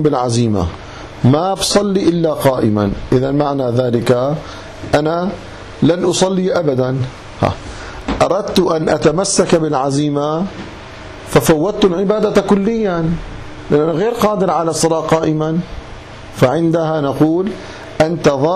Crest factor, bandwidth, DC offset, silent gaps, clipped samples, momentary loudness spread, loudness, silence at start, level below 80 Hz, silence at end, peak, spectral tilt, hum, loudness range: 12 dB; 14 kHz; under 0.1%; none; under 0.1%; 16 LU; -15 LUFS; 0 s; -36 dBFS; 0 s; -2 dBFS; -5.5 dB/octave; none; 2 LU